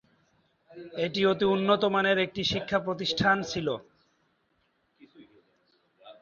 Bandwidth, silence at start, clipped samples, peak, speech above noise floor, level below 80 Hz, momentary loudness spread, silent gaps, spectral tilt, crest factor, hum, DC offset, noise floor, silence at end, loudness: 7.2 kHz; 0.7 s; under 0.1%; -8 dBFS; 45 dB; -60 dBFS; 9 LU; none; -5 dB/octave; 22 dB; none; under 0.1%; -72 dBFS; 0.1 s; -27 LUFS